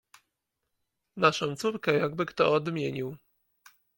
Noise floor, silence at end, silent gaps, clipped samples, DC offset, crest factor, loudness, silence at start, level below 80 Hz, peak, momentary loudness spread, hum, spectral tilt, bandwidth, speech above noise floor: -82 dBFS; 0.8 s; none; under 0.1%; under 0.1%; 22 dB; -28 LUFS; 1.15 s; -70 dBFS; -8 dBFS; 11 LU; none; -5.5 dB/octave; 17 kHz; 55 dB